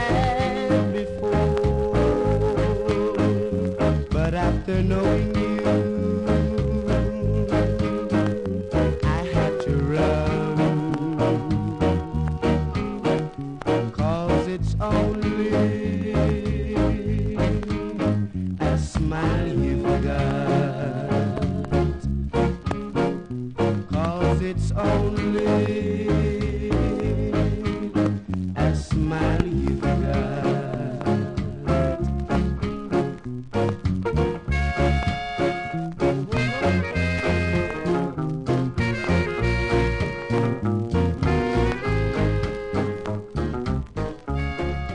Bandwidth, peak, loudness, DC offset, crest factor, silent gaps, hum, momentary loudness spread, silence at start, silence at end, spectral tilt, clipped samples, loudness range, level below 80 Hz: 10.5 kHz; -6 dBFS; -24 LUFS; under 0.1%; 18 dB; none; none; 5 LU; 0 s; 0 s; -7.5 dB/octave; under 0.1%; 2 LU; -32 dBFS